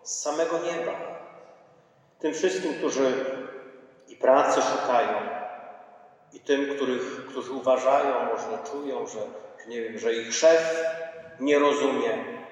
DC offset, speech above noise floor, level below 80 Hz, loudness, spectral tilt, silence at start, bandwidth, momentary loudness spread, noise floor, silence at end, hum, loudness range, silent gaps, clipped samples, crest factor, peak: under 0.1%; 34 dB; -86 dBFS; -26 LUFS; -3 dB/octave; 0.05 s; 10.5 kHz; 17 LU; -59 dBFS; 0 s; none; 4 LU; none; under 0.1%; 20 dB; -8 dBFS